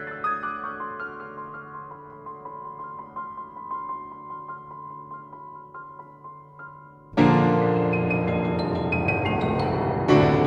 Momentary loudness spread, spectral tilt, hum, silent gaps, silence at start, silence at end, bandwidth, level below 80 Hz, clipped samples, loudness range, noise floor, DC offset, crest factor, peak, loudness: 22 LU; -8.5 dB/octave; none; none; 0 s; 0 s; 7.6 kHz; -50 dBFS; under 0.1%; 15 LU; -45 dBFS; under 0.1%; 20 dB; -6 dBFS; -24 LUFS